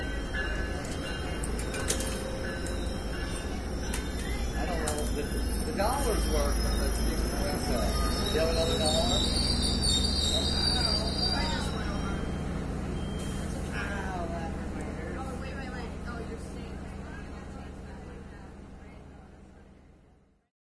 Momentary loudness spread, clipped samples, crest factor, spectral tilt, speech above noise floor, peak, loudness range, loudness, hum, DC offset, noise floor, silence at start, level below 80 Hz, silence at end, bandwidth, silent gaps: 16 LU; under 0.1%; 18 dB; -4 dB/octave; 35 dB; -12 dBFS; 15 LU; -30 LUFS; none; 0.3%; -62 dBFS; 0 s; -36 dBFS; 0.15 s; 11 kHz; none